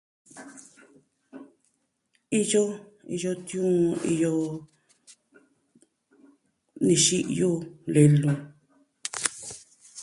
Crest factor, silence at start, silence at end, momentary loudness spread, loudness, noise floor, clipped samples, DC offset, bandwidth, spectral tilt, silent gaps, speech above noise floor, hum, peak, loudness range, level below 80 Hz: 24 dB; 0.35 s; 0 s; 22 LU; -25 LUFS; -73 dBFS; under 0.1%; under 0.1%; 11.5 kHz; -5 dB/octave; none; 50 dB; none; -4 dBFS; 7 LU; -66 dBFS